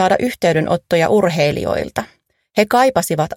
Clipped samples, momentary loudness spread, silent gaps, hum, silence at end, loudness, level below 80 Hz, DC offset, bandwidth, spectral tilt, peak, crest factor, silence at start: under 0.1%; 9 LU; none; none; 0 s; -16 LUFS; -46 dBFS; under 0.1%; 16.5 kHz; -5 dB/octave; 0 dBFS; 16 dB; 0 s